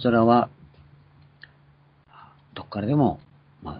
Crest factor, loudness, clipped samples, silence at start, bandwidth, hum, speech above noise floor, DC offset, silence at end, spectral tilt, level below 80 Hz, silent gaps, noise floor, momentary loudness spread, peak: 20 dB; -22 LUFS; under 0.1%; 0 s; 5 kHz; none; 37 dB; under 0.1%; 0 s; -11.5 dB/octave; -56 dBFS; none; -57 dBFS; 23 LU; -6 dBFS